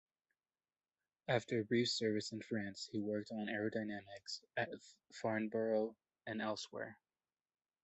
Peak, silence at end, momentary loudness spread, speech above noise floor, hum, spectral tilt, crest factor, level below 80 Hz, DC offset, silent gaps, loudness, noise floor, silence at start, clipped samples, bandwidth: -20 dBFS; 0.9 s; 12 LU; over 49 dB; none; -5 dB/octave; 22 dB; -80 dBFS; under 0.1%; none; -41 LUFS; under -90 dBFS; 1.3 s; under 0.1%; 8.2 kHz